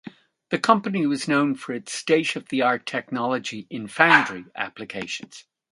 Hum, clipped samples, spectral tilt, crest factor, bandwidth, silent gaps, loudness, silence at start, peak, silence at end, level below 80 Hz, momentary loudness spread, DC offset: none; under 0.1%; -4 dB/octave; 24 dB; 11.5 kHz; none; -23 LUFS; 0.05 s; 0 dBFS; 0.3 s; -70 dBFS; 15 LU; under 0.1%